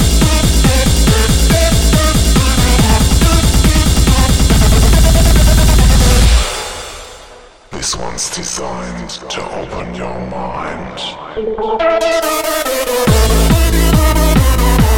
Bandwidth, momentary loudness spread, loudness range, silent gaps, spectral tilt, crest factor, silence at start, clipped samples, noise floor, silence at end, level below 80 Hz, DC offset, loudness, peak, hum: 17 kHz; 13 LU; 11 LU; none; -4.5 dB/octave; 10 dB; 0 s; under 0.1%; -38 dBFS; 0 s; -14 dBFS; 1%; -12 LUFS; 0 dBFS; none